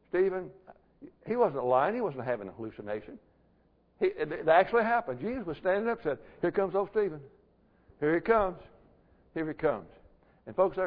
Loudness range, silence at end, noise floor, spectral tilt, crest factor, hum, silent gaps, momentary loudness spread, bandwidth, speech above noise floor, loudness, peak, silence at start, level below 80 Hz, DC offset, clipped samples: 4 LU; 0 s; -67 dBFS; -9.5 dB/octave; 20 dB; none; none; 15 LU; 5.2 kHz; 37 dB; -30 LUFS; -10 dBFS; 0.15 s; -60 dBFS; under 0.1%; under 0.1%